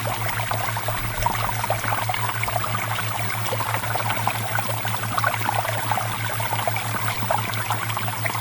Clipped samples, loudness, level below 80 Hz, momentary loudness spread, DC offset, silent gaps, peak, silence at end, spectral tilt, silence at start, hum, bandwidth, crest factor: under 0.1%; -23 LUFS; -44 dBFS; 2 LU; under 0.1%; none; -6 dBFS; 0 s; -3.5 dB/octave; 0 s; none; 19 kHz; 18 dB